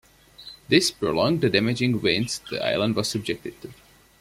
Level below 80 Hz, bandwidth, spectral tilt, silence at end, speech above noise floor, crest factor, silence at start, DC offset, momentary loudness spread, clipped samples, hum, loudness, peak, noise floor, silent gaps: -56 dBFS; 16 kHz; -4.5 dB/octave; 0.5 s; 23 dB; 20 dB; 0.4 s; under 0.1%; 22 LU; under 0.1%; none; -23 LUFS; -4 dBFS; -47 dBFS; none